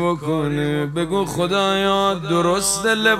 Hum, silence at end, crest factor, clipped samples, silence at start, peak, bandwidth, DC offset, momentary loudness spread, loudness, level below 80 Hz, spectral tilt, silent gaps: none; 0 s; 16 dB; under 0.1%; 0 s; -4 dBFS; 16 kHz; under 0.1%; 4 LU; -19 LUFS; -46 dBFS; -4 dB/octave; none